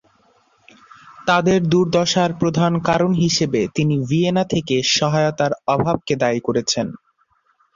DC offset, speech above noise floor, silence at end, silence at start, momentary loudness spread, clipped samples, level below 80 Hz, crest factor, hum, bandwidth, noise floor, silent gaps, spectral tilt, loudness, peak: under 0.1%; 45 dB; 0.8 s; 1.05 s; 4 LU; under 0.1%; -52 dBFS; 16 dB; none; 7.6 kHz; -63 dBFS; none; -5 dB/octave; -18 LUFS; -2 dBFS